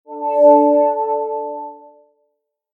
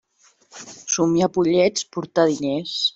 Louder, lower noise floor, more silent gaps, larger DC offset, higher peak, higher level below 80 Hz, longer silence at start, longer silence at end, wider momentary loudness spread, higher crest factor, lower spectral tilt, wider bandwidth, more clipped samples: first, -15 LUFS vs -20 LUFS; first, -71 dBFS vs -58 dBFS; neither; neither; first, 0 dBFS vs -4 dBFS; second, under -90 dBFS vs -60 dBFS; second, 0.1 s vs 0.55 s; first, 0.95 s vs 0.05 s; about the same, 18 LU vs 16 LU; about the same, 16 dB vs 16 dB; first, -7.5 dB/octave vs -4 dB/octave; second, 2.8 kHz vs 8 kHz; neither